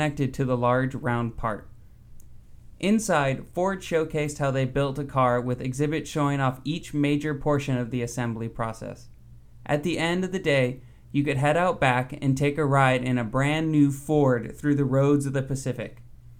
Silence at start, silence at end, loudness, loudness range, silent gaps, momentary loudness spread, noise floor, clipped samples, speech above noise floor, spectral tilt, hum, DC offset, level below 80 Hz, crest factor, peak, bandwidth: 0 s; 0.05 s; -25 LUFS; 5 LU; none; 9 LU; -47 dBFS; under 0.1%; 23 dB; -6.5 dB/octave; none; under 0.1%; -48 dBFS; 18 dB; -8 dBFS; 15.5 kHz